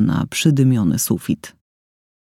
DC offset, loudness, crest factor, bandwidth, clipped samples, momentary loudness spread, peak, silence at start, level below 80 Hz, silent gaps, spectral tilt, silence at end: under 0.1%; -18 LUFS; 16 dB; 17 kHz; under 0.1%; 9 LU; -2 dBFS; 0 s; -50 dBFS; none; -5.5 dB/octave; 0.9 s